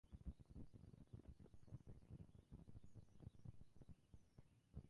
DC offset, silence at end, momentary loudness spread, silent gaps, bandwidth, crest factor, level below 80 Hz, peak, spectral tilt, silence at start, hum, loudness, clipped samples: under 0.1%; 0 s; 7 LU; none; 10.5 kHz; 20 dB; -66 dBFS; -42 dBFS; -8.5 dB/octave; 0.05 s; none; -64 LUFS; under 0.1%